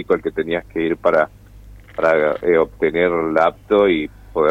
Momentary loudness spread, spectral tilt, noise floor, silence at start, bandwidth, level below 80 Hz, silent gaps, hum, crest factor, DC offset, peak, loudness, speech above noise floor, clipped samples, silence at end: 7 LU; -7 dB/octave; -41 dBFS; 0 s; 7.6 kHz; -44 dBFS; none; none; 16 dB; under 0.1%; -2 dBFS; -18 LUFS; 24 dB; under 0.1%; 0 s